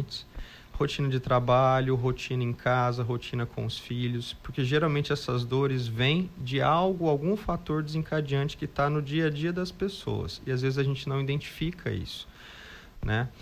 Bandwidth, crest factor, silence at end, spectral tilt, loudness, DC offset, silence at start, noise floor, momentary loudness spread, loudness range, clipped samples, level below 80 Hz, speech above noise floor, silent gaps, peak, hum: 15 kHz; 16 dB; 0 s; -7 dB/octave; -29 LUFS; under 0.1%; 0 s; -47 dBFS; 11 LU; 4 LU; under 0.1%; -48 dBFS; 20 dB; none; -12 dBFS; none